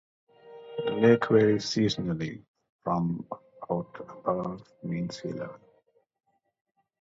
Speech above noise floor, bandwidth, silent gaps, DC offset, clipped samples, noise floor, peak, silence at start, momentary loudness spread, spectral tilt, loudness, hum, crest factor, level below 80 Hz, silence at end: 40 dB; 7.8 kHz; 2.48-2.54 s, 2.70-2.79 s; under 0.1%; under 0.1%; -68 dBFS; -8 dBFS; 0.45 s; 19 LU; -6.5 dB/octave; -28 LUFS; none; 22 dB; -62 dBFS; 1.45 s